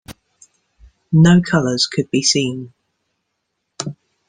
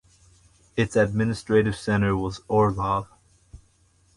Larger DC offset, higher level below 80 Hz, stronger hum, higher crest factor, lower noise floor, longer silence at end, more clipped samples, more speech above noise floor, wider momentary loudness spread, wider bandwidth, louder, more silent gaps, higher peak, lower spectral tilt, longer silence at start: neither; second, -52 dBFS vs -46 dBFS; neither; about the same, 18 dB vs 16 dB; first, -74 dBFS vs -62 dBFS; second, 0.35 s vs 0.6 s; neither; first, 59 dB vs 39 dB; first, 17 LU vs 6 LU; second, 10 kHz vs 11.5 kHz; first, -15 LUFS vs -24 LUFS; neither; first, -2 dBFS vs -8 dBFS; second, -5 dB/octave vs -7 dB/octave; second, 0.1 s vs 0.75 s